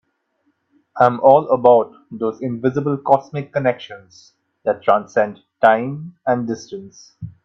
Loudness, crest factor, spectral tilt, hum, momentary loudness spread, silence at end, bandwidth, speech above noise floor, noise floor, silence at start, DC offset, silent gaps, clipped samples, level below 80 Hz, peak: -18 LUFS; 18 dB; -7 dB/octave; none; 18 LU; 0.15 s; 7 kHz; 49 dB; -67 dBFS; 0.95 s; under 0.1%; none; under 0.1%; -64 dBFS; 0 dBFS